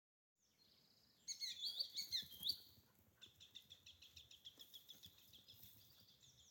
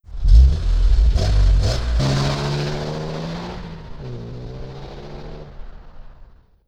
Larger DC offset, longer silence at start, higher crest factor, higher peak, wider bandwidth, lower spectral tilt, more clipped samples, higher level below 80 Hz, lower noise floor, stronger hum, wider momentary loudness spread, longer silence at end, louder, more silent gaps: neither; first, 0.6 s vs 0.1 s; first, 24 dB vs 18 dB; second, -30 dBFS vs -2 dBFS; first, 17 kHz vs 8.8 kHz; second, 0.5 dB/octave vs -6 dB/octave; neither; second, -86 dBFS vs -20 dBFS; first, -76 dBFS vs -45 dBFS; neither; about the same, 21 LU vs 20 LU; second, 0 s vs 0.45 s; second, -48 LUFS vs -20 LUFS; neither